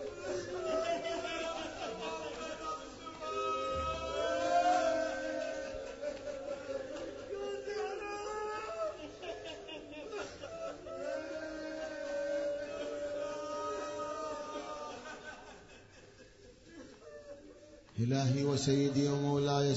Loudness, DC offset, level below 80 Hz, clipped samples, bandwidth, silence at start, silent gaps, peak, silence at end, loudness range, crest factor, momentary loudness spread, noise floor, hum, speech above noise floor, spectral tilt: -37 LUFS; under 0.1%; -62 dBFS; under 0.1%; 7.6 kHz; 0 s; none; -18 dBFS; 0 s; 8 LU; 18 dB; 20 LU; -58 dBFS; none; 27 dB; -5 dB/octave